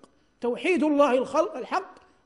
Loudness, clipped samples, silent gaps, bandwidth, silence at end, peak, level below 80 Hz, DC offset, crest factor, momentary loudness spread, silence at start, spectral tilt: -25 LUFS; under 0.1%; none; 11 kHz; 0.35 s; -8 dBFS; -68 dBFS; under 0.1%; 18 dB; 10 LU; 0.4 s; -4.5 dB/octave